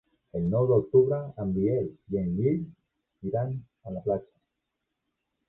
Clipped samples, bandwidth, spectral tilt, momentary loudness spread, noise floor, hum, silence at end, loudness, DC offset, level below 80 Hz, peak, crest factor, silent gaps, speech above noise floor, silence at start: under 0.1%; 2.4 kHz; -13.5 dB/octave; 15 LU; -83 dBFS; none; 1.25 s; -28 LUFS; under 0.1%; -54 dBFS; -10 dBFS; 18 dB; none; 56 dB; 0.35 s